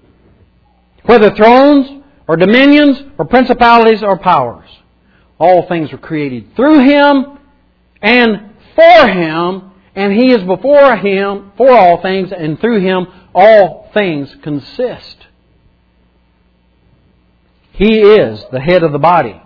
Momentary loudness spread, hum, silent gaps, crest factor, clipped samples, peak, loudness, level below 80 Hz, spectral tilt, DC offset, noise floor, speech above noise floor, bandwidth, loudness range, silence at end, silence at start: 14 LU; none; none; 10 dB; 2%; 0 dBFS; -9 LUFS; -40 dBFS; -8 dB/octave; under 0.1%; -52 dBFS; 44 dB; 5.4 kHz; 7 LU; 0.15 s; 1.05 s